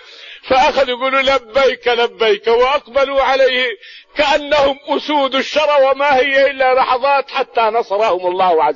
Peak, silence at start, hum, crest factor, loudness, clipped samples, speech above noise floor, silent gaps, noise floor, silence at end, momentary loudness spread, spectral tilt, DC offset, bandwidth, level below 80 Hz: -4 dBFS; 0.1 s; none; 10 dB; -14 LUFS; under 0.1%; 21 dB; none; -35 dBFS; 0 s; 5 LU; -3 dB/octave; under 0.1%; 7.4 kHz; -46 dBFS